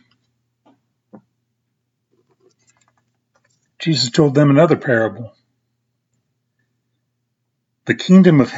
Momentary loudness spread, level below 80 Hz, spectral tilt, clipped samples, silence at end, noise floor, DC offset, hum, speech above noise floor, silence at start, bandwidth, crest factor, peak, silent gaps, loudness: 19 LU; -62 dBFS; -6.5 dB/octave; under 0.1%; 0 s; -73 dBFS; under 0.1%; none; 60 dB; 3.8 s; 7.8 kHz; 18 dB; 0 dBFS; none; -14 LUFS